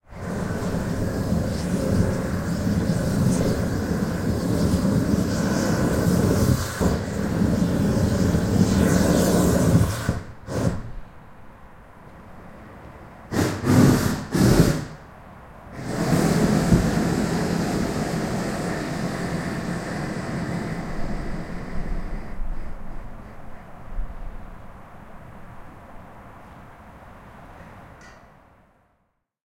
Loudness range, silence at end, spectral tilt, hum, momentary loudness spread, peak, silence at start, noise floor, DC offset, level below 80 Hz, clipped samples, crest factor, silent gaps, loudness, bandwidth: 20 LU; 1.4 s; -6.5 dB/octave; none; 25 LU; -4 dBFS; 0.1 s; -71 dBFS; under 0.1%; -36 dBFS; under 0.1%; 20 dB; none; -23 LUFS; 16.5 kHz